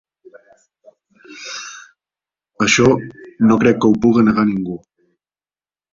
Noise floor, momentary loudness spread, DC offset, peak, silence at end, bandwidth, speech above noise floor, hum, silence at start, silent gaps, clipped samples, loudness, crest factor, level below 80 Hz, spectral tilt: under -90 dBFS; 20 LU; under 0.1%; 0 dBFS; 1.15 s; 7.6 kHz; over 76 dB; none; 1.3 s; none; under 0.1%; -15 LUFS; 18 dB; -50 dBFS; -5 dB/octave